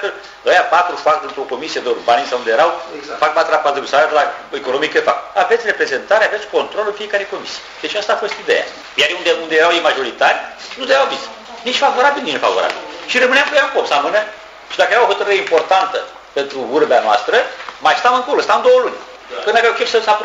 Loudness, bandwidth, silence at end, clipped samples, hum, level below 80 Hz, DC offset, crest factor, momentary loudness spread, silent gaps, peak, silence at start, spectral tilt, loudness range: -15 LUFS; 10 kHz; 0 s; under 0.1%; none; -60 dBFS; under 0.1%; 14 dB; 12 LU; none; 0 dBFS; 0 s; -1.5 dB/octave; 2 LU